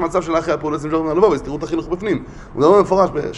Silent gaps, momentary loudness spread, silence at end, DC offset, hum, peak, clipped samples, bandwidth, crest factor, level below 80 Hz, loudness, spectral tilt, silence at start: none; 10 LU; 0 s; under 0.1%; none; 0 dBFS; under 0.1%; 10.5 kHz; 16 dB; -40 dBFS; -17 LUFS; -6.5 dB/octave; 0 s